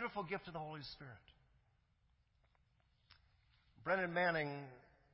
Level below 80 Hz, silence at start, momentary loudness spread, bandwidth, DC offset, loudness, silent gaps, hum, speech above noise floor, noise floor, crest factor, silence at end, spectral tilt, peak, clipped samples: -74 dBFS; 0 s; 20 LU; 5.6 kHz; under 0.1%; -41 LUFS; none; none; 36 dB; -77 dBFS; 20 dB; 0.3 s; -3.5 dB/octave; -26 dBFS; under 0.1%